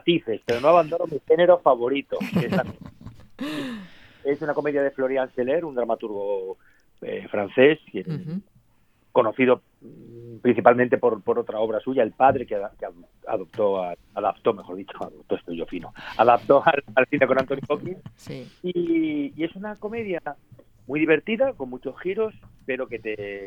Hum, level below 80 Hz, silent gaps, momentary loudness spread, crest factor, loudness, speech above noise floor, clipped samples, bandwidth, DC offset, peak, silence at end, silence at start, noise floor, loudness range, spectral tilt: none; -58 dBFS; none; 17 LU; 24 dB; -23 LUFS; 38 dB; under 0.1%; 12.5 kHz; under 0.1%; 0 dBFS; 0 s; 0.05 s; -61 dBFS; 5 LU; -7 dB/octave